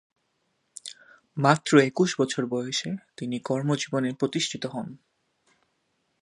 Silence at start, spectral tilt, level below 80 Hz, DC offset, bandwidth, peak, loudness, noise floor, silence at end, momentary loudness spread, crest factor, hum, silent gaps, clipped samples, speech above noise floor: 0.85 s; -5 dB/octave; -72 dBFS; under 0.1%; 11.5 kHz; -2 dBFS; -26 LUFS; -74 dBFS; 1.25 s; 21 LU; 26 dB; none; none; under 0.1%; 49 dB